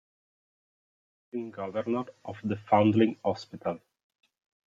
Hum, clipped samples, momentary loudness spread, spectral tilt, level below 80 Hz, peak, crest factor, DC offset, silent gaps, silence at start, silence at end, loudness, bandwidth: none; under 0.1%; 16 LU; -8 dB/octave; -74 dBFS; -10 dBFS; 22 dB; under 0.1%; none; 1.35 s; 0.9 s; -29 LUFS; 7.4 kHz